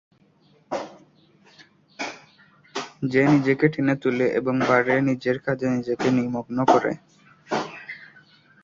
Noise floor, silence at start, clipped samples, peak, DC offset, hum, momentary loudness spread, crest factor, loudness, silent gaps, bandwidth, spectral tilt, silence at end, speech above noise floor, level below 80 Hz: -59 dBFS; 0.7 s; under 0.1%; -2 dBFS; under 0.1%; none; 16 LU; 22 dB; -23 LUFS; none; 7.6 kHz; -6.5 dB/octave; 0.6 s; 38 dB; -62 dBFS